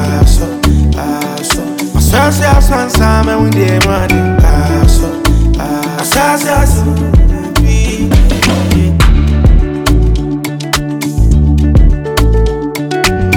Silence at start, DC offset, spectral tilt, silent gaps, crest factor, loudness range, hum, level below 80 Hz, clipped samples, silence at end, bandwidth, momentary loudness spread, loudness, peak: 0 s; under 0.1%; -5.5 dB/octave; none; 8 dB; 2 LU; none; -12 dBFS; under 0.1%; 0 s; 19 kHz; 6 LU; -11 LUFS; 0 dBFS